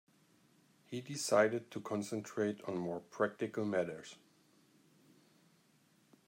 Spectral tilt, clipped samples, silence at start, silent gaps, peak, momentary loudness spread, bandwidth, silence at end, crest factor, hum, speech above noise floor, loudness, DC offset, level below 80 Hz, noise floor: -4.5 dB/octave; under 0.1%; 0.9 s; none; -16 dBFS; 14 LU; 16 kHz; 2.15 s; 24 dB; none; 34 dB; -37 LUFS; under 0.1%; -86 dBFS; -71 dBFS